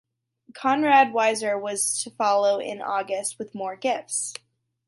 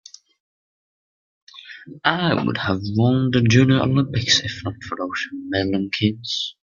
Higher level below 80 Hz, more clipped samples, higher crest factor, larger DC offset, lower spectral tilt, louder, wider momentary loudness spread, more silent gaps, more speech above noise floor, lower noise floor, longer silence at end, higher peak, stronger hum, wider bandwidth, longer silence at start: second, -78 dBFS vs -54 dBFS; neither; about the same, 18 dB vs 20 dB; neither; second, -2 dB/octave vs -5 dB/octave; second, -24 LUFS vs -20 LUFS; about the same, 13 LU vs 13 LU; neither; second, 32 dB vs over 70 dB; second, -56 dBFS vs under -90 dBFS; first, 0.55 s vs 0.2 s; second, -6 dBFS vs -2 dBFS; neither; first, 12 kHz vs 7.4 kHz; second, 0.55 s vs 1.55 s